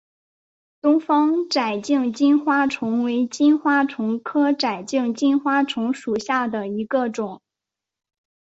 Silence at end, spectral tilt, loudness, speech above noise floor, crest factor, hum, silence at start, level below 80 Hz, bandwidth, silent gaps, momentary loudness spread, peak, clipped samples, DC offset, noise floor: 1.1 s; -4.5 dB/octave; -21 LUFS; 66 dB; 14 dB; none; 0.85 s; -68 dBFS; 8 kHz; none; 7 LU; -6 dBFS; under 0.1%; under 0.1%; -86 dBFS